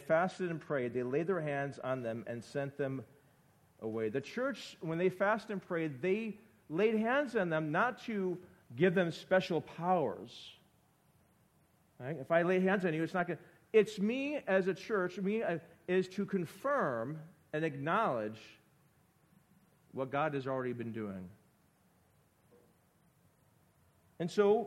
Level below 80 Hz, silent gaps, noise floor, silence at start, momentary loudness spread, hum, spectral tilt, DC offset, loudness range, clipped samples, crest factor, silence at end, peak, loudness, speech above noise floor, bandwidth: -78 dBFS; none; -70 dBFS; 0 s; 13 LU; none; -7 dB/octave; under 0.1%; 8 LU; under 0.1%; 22 dB; 0 s; -14 dBFS; -35 LUFS; 36 dB; 14 kHz